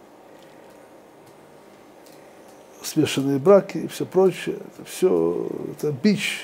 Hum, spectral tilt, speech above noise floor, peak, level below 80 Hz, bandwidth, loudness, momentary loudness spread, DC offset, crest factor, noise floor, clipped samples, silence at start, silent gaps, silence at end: none; -5.5 dB/octave; 27 dB; -2 dBFS; -68 dBFS; 16 kHz; -22 LUFS; 14 LU; under 0.1%; 20 dB; -48 dBFS; under 0.1%; 2.8 s; none; 0 s